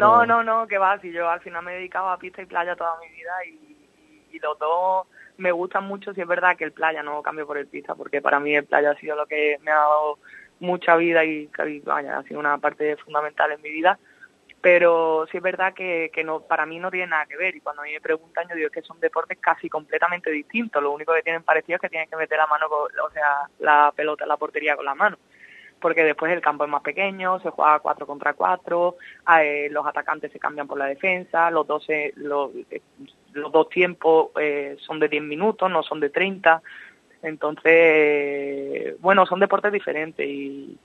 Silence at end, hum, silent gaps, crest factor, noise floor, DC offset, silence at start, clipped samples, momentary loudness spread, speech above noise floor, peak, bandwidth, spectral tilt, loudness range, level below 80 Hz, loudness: 0.1 s; none; none; 22 dB; -56 dBFS; under 0.1%; 0 s; under 0.1%; 12 LU; 34 dB; 0 dBFS; 6.8 kHz; -6.5 dB/octave; 6 LU; -74 dBFS; -22 LUFS